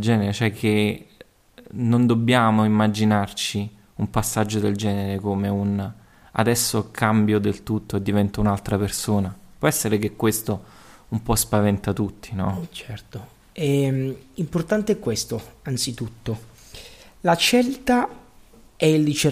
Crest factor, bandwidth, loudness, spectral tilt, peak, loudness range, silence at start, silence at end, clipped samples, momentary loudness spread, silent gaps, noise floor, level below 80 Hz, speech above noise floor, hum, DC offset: 18 dB; 15.5 kHz; -22 LUFS; -5 dB/octave; -4 dBFS; 5 LU; 0 s; 0 s; under 0.1%; 13 LU; none; -50 dBFS; -46 dBFS; 28 dB; none; under 0.1%